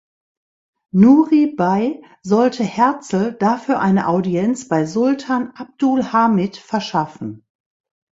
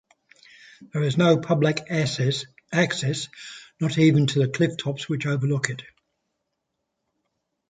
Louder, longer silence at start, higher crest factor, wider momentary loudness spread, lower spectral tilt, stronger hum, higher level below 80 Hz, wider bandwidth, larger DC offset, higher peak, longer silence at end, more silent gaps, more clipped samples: first, -17 LUFS vs -23 LUFS; first, 0.95 s vs 0.8 s; about the same, 16 dB vs 20 dB; about the same, 10 LU vs 12 LU; first, -7 dB/octave vs -5.5 dB/octave; neither; about the same, -60 dBFS vs -64 dBFS; second, 8 kHz vs 9.4 kHz; neither; first, 0 dBFS vs -4 dBFS; second, 0.75 s vs 1.85 s; neither; neither